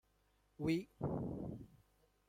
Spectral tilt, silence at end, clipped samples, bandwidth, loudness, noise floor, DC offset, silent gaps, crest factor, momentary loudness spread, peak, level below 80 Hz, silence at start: -7.5 dB/octave; 0.6 s; under 0.1%; 16 kHz; -43 LUFS; -76 dBFS; under 0.1%; none; 18 dB; 14 LU; -26 dBFS; -64 dBFS; 0.6 s